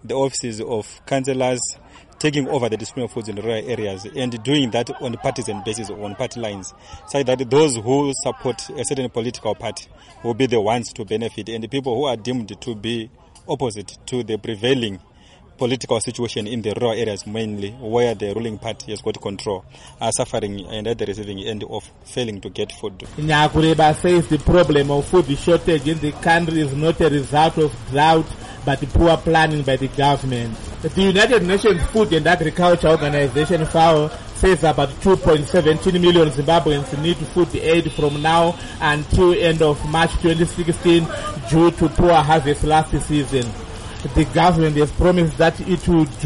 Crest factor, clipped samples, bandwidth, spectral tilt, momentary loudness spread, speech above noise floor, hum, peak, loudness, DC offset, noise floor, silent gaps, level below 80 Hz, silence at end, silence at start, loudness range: 14 dB; under 0.1%; 11.5 kHz; -5.5 dB/octave; 12 LU; 29 dB; none; -4 dBFS; -19 LUFS; under 0.1%; -47 dBFS; none; -34 dBFS; 0 s; 0.05 s; 8 LU